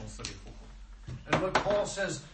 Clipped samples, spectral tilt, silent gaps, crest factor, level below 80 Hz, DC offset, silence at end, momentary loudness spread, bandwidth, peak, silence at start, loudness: under 0.1%; -4 dB/octave; none; 22 dB; -48 dBFS; under 0.1%; 0 s; 22 LU; 8.8 kHz; -12 dBFS; 0 s; -31 LUFS